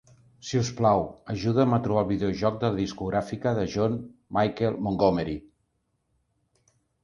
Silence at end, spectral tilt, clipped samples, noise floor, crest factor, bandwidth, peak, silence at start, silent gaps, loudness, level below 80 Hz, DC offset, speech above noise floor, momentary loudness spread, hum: 1.65 s; -7 dB/octave; under 0.1%; -75 dBFS; 20 dB; 10.5 kHz; -6 dBFS; 0.45 s; none; -26 LUFS; -50 dBFS; under 0.1%; 49 dB; 8 LU; none